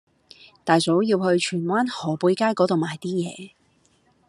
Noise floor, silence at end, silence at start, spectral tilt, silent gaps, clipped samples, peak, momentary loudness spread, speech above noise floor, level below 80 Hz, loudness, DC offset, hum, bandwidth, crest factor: -62 dBFS; 0.8 s; 0.65 s; -5.5 dB/octave; none; under 0.1%; -2 dBFS; 8 LU; 41 dB; -70 dBFS; -22 LUFS; under 0.1%; none; 11 kHz; 22 dB